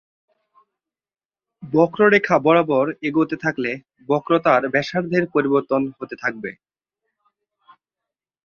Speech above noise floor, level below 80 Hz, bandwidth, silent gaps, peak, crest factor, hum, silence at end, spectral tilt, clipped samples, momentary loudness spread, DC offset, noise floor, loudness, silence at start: 68 dB; -64 dBFS; 7 kHz; none; -2 dBFS; 20 dB; none; 1.95 s; -7 dB/octave; under 0.1%; 11 LU; under 0.1%; -87 dBFS; -19 LUFS; 1.6 s